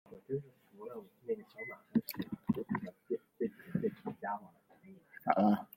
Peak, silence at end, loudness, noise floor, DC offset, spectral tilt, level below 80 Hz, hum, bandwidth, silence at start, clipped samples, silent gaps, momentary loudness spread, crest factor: -12 dBFS; 0.1 s; -38 LUFS; -60 dBFS; under 0.1%; -8 dB/octave; -76 dBFS; none; 16.5 kHz; 0.1 s; under 0.1%; none; 16 LU; 26 dB